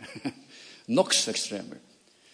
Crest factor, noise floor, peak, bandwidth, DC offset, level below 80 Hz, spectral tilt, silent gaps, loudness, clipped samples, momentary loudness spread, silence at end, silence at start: 24 dB; -51 dBFS; -6 dBFS; 10.5 kHz; under 0.1%; -80 dBFS; -2 dB/octave; none; -27 LUFS; under 0.1%; 23 LU; 0.55 s; 0 s